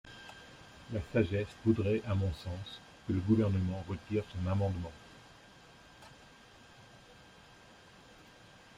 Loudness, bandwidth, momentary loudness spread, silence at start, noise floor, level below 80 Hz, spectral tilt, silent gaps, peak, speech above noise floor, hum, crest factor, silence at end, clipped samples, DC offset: -34 LUFS; 10.5 kHz; 26 LU; 0.05 s; -58 dBFS; -58 dBFS; -8 dB/octave; none; -16 dBFS; 25 dB; none; 20 dB; 1.65 s; under 0.1%; under 0.1%